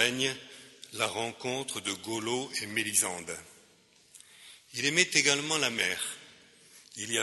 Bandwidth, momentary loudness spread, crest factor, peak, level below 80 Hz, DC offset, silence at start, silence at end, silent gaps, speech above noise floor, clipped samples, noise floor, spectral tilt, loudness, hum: 12 kHz; 20 LU; 26 dB; -6 dBFS; -74 dBFS; under 0.1%; 0 s; 0 s; none; 31 dB; under 0.1%; -62 dBFS; -1.5 dB/octave; -29 LUFS; none